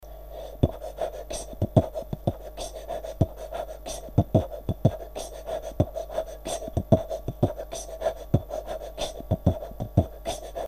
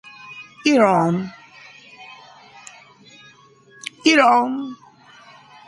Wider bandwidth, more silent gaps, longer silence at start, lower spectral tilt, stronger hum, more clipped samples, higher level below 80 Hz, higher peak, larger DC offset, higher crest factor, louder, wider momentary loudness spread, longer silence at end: first, 15.5 kHz vs 11.5 kHz; neither; second, 0 s vs 0.25 s; first, -7 dB/octave vs -5 dB/octave; neither; neither; first, -40 dBFS vs -66 dBFS; about the same, -2 dBFS vs -2 dBFS; first, 0.2% vs under 0.1%; first, 26 dB vs 20 dB; second, -29 LUFS vs -17 LUFS; second, 12 LU vs 27 LU; second, 0 s vs 0.95 s